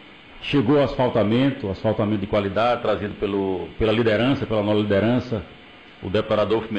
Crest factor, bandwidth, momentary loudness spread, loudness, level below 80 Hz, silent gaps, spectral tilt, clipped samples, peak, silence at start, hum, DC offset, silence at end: 10 dB; 8.4 kHz; 7 LU; -22 LUFS; -44 dBFS; none; -8 dB/octave; under 0.1%; -12 dBFS; 0 s; none; under 0.1%; 0 s